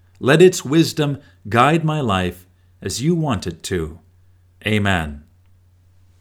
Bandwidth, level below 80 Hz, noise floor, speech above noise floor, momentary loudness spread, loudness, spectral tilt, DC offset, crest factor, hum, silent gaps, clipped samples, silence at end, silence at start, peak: 17.5 kHz; -44 dBFS; -52 dBFS; 35 dB; 14 LU; -18 LUFS; -5.5 dB/octave; under 0.1%; 20 dB; none; none; under 0.1%; 1 s; 0.2 s; 0 dBFS